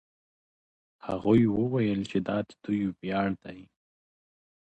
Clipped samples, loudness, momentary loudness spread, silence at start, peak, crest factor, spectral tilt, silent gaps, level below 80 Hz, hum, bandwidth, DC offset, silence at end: under 0.1%; -28 LUFS; 14 LU; 1.05 s; -10 dBFS; 20 dB; -8.5 dB/octave; none; -58 dBFS; none; 8.4 kHz; under 0.1%; 1.15 s